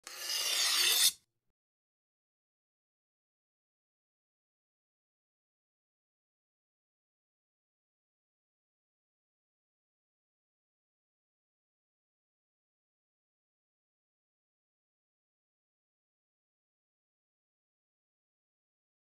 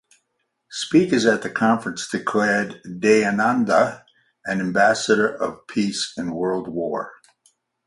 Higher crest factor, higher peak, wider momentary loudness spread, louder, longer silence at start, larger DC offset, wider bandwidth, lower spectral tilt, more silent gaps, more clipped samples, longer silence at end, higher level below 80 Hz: first, 30 dB vs 18 dB; second, -14 dBFS vs -4 dBFS; second, 8 LU vs 11 LU; second, -28 LUFS vs -21 LUFS; second, 0.05 s vs 0.7 s; neither; first, 15 kHz vs 11.5 kHz; second, 4 dB/octave vs -4.5 dB/octave; neither; neither; first, 17.9 s vs 0.75 s; second, under -90 dBFS vs -62 dBFS